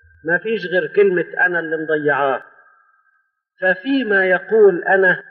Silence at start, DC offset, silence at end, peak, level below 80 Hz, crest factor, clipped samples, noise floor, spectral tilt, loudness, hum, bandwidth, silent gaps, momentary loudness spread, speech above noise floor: 0.25 s; under 0.1%; 0.1 s; -4 dBFS; -68 dBFS; 14 dB; under 0.1%; -65 dBFS; -3.5 dB/octave; -17 LUFS; none; 4.8 kHz; none; 7 LU; 48 dB